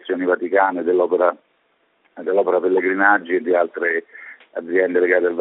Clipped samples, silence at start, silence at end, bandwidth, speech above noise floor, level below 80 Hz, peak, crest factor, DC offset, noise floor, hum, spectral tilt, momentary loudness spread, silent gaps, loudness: under 0.1%; 0.05 s; 0 s; 4 kHz; 45 dB; -72 dBFS; 0 dBFS; 18 dB; under 0.1%; -64 dBFS; none; -3.5 dB/octave; 15 LU; none; -18 LUFS